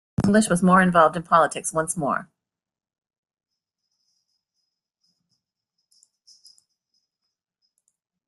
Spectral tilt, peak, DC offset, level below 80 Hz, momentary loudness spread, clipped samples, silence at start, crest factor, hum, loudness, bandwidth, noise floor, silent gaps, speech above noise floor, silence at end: -5.5 dB/octave; -4 dBFS; under 0.1%; -58 dBFS; 9 LU; under 0.1%; 0.2 s; 20 dB; none; -20 LUFS; 12.5 kHz; -80 dBFS; none; 61 dB; 6.05 s